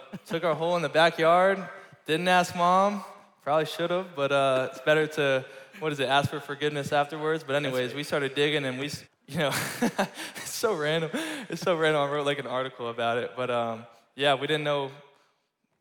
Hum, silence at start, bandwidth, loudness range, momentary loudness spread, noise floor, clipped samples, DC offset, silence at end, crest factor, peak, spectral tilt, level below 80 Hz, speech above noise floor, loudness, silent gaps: none; 0 s; 19.5 kHz; 4 LU; 11 LU; -74 dBFS; under 0.1%; under 0.1%; 0.8 s; 18 dB; -10 dBFS; -4.5 dB/octave; -76 dBFS; 48 dB; -27 LUFS; none